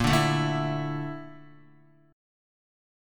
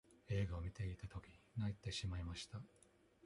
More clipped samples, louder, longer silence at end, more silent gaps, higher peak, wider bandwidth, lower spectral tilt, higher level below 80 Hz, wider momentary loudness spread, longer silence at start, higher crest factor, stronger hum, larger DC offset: neither; first, -27 LUFS vs -47 LUFS; first, 1 s vs 0.6 s; neither; first, -10 dBFS vs -30 dBFS; first, 17.5 kHz vs 11.5 kHz; about the same, -5.5 dB/octave vs -5.5 dB/octave; first, -48 dBFS vs -56 dBFS; first, 18 LU vs 11 LU; about the same, 0 s vs 0.1 s; about the same, 20 dB vs 18 dB; neither; neither